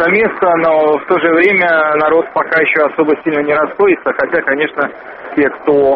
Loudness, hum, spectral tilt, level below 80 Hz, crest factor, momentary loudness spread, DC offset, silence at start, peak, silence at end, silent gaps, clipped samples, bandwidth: -12 LUFS; none; -3.5 dB/octave; -52 dBFS; 12 dB; 5 LU; under 0.1%; 0 s; 0 dBFS; 0 s; none; under 0.1%; 5.4 kHz